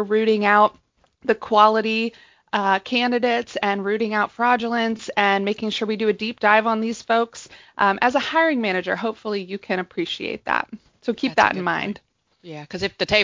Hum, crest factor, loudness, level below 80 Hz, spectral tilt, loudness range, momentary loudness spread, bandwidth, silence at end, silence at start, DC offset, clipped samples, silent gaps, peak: none; 20 dB; -21 LUFS; -58 dBFS; -4.5 dB/octave; 4 LU; 12 LU; 7.6 kHz; 0 s; 0 s; under 0.1%; under 0.1%; none; 0 dBFS